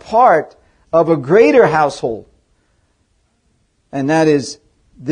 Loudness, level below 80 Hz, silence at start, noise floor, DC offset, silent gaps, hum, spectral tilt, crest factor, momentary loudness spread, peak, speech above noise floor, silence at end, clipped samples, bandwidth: -13 LUFS; -52 dBFS; 0.05 s; -61 dBFS; under 0.1%; none; none; -6 dB/octave; 16 dB; 19 LU; 0 dBFS; 49 dB; 0 s; under 0.1%; 10 kHz